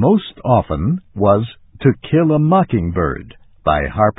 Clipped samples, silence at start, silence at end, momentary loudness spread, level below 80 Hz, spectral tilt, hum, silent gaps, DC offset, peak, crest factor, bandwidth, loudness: under 0.1%; 0 s; 0.05 s; 8 LU; -34 dBFS; -13 dB/octave; none; none; under 0.1%; 0 dBFS; 16 dB; 4 kHz; -16 LUFS